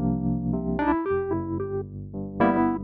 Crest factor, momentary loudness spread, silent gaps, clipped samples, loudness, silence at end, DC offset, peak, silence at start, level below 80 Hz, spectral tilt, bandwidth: 18 dB; 12 LU; none; under 0.1%; -26 LUFS; 0 s; under 0.1%; -8 dBFS; 0 s; -42 dBFS; -11.5 dB/octave; 4.5 kHz